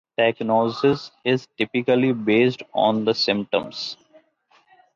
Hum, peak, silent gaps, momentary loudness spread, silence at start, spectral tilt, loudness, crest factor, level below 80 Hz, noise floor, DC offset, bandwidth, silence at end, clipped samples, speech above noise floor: none; -6 dBFS; none; 7 LU; 0.2 s; -6 dB/octave; -21 LUFS; 16 dB; -64 dBFS; -60 dBFS; under 0.1%; 7.4 kHz; 1 s; under 0.1%; 39 dB